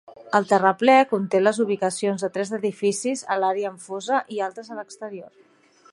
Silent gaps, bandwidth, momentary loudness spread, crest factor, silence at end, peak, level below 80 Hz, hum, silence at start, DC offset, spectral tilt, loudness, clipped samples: none; 11.5 kHz; 18 LU; 20 dB; 0.65 s; -4 dBFS; -76 dBFS; none; 0.2 s; under 0.1%; -4.5 dB/octave; -22 LUFS; under 0.1%